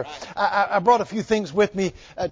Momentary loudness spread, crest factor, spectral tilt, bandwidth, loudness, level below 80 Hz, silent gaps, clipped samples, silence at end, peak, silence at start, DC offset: 10 LU; 18 dB; -5 dB/octave; 7.8 kHz; -22 LUFS; -52 dBFS; none; under 0.1%; 0 s; -4 dBFS; 0 s; under 0.1%